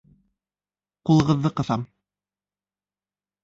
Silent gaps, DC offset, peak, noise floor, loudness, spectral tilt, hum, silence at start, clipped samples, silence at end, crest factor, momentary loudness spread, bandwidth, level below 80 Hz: none; under 0.1%; -8 dBFS; under -90 dBFS; -22 LUFS; -7.5 dB/octave; none; 1.05 s; under 0.1%; 1.6 s; 20 dB; 13 LU; 7.8 kHz; -54 dBFS